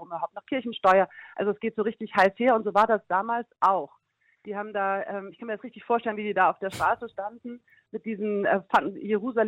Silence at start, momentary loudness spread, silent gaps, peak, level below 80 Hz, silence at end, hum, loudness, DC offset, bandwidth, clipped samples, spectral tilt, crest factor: 0 s; 15 LU; none; -10 dBFS; -66 dBFS; 0 s; none; -26 LUFS; under 0.1%; 15.5 kHz; under 0.1%; -6 dB/octave; 18 dB